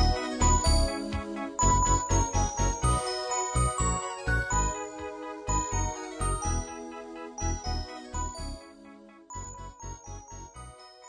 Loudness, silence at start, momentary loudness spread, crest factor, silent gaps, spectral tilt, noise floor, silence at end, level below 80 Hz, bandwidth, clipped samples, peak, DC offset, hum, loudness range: -29 LUFS; 0 s; 19 LU; 18 dB; none; -3.5 dB/octave; -51 dBFS; 0 s; -34 dBFS; 11 kHz; under 0.1%; -12 dBFS; under 0.1%; none; 11 LU